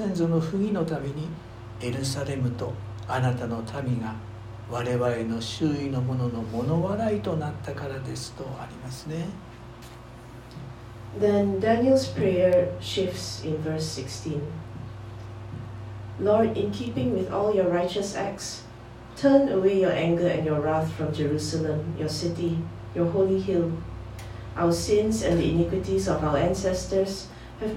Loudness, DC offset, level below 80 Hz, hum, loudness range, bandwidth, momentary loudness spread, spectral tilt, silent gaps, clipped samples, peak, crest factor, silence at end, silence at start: -26 LUFS; under 0.1%; -46 dBFS; none; 7 LU; 16 kHz; 17 LU; -6.5 dB/octave; none; under 0.1%; -6 dBFS; 20 dB; 0 s; 0 s